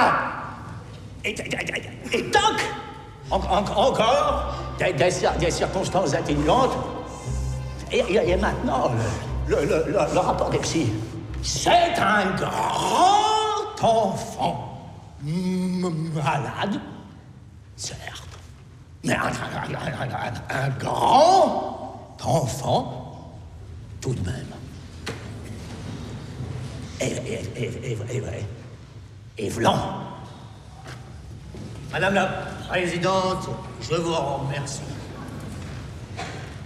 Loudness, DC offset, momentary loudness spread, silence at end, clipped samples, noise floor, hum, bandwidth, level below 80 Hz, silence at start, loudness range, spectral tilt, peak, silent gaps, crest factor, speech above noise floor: -24 LUFS; under 0.1%; 19 LU; 0 s; under 0.1%; -45 dBFS; none; 15 kHz; -40 dBFS; 0 s; 10 LU; -5 dB/octave; -4 dBFS; none; 20 dB; 22 dB